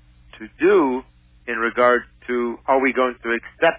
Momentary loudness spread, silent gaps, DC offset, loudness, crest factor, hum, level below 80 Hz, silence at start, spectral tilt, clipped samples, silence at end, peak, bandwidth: 13 LU; none; under 0.1%; -20 LUFS; 16 dB; none; -52 dBFS; 0.35 s; -8.5 dB/octave; under 0.1%; 0 s; -4 dBFS; 4 kHz